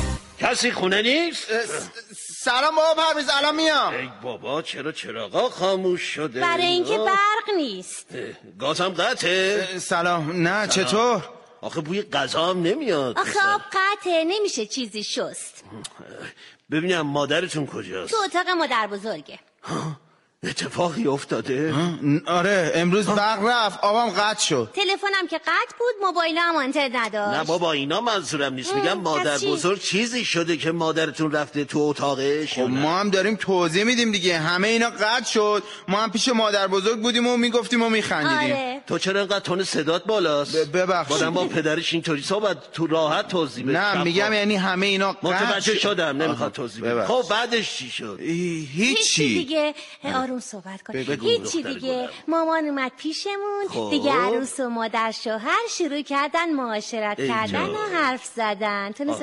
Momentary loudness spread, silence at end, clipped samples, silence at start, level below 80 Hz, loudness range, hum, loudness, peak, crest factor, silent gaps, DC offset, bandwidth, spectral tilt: 9 LU; 0 s; under 0.1%; 0 s; -54 dBFS; 5 LU; none; -22 LUFS; -8 dBFS; 16 dB; none; under 0.1%; 11.5 kHz; -3.5 dB/octave